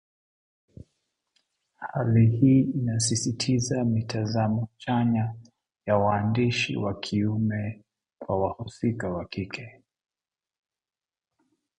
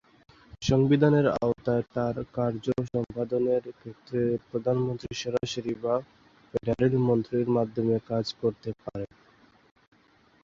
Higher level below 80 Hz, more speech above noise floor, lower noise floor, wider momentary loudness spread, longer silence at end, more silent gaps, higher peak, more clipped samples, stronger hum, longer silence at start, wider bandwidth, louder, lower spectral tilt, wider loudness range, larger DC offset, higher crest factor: about the same, -54 dBFS vs -54 dBFS; first, over 65 dB vs 35 dB; first, under -90 dBFS vs -62 dBFS; about the same, 13 LU vs 12 LU; first, 2.1 s vs 1.4 s; neither; about the same, -8 dBFS vs -8 dBFS; neither; neither; first, 1.8 s vs 0.6 s; first, 11 kHz vs 7.6 kHz; about the same, -26 LUFS vs -28 LUFS; about the same, -6 dB/octave vs -7 dB/octave; first, 9 LU vs 4 LU; neither; about the same, 20 dB vs 20 dB